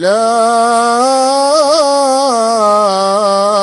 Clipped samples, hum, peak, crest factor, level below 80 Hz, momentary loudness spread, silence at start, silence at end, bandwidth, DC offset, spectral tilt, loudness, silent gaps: under 0.1%; none; 0 dBFS; 10 dB; -56 dBFS; 2 LU; 0 s; 0 s; 13.5 kHz; under 0.1%; -2.5 dB/octave; -10 LUFS; none